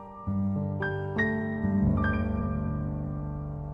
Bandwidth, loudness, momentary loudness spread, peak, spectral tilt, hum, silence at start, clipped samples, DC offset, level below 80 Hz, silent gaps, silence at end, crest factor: 6.2 kHz; -30 LUFS; 8 LU; -14 dBFS; -10 dB/octave; none; 0 s; under 0.1%; under 0.1%; -40 dBFS; none; 0 s; 16 dB